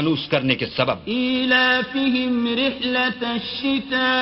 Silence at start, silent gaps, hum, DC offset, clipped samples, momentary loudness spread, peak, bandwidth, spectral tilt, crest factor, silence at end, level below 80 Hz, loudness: 0 s; none; none; under 0.1%; under 0.1%; 7 LU; -2 dBFS; 6 kHz; -7 dB/octave; 18 dB; 0 s; -54 dBFS; -20 LUFS